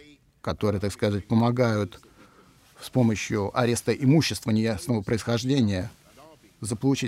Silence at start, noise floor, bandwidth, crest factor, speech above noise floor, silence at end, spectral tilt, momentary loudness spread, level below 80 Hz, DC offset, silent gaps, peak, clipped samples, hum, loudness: 0.45 s; -56 dBFS; 15.5 kHz; 18 dB; 32 dB; 0 s; -6 dB/octave; 12 LU; -56 dBFS; under 0.1%; none; -8 dBFS; under 0.1%; none; -25 LUFS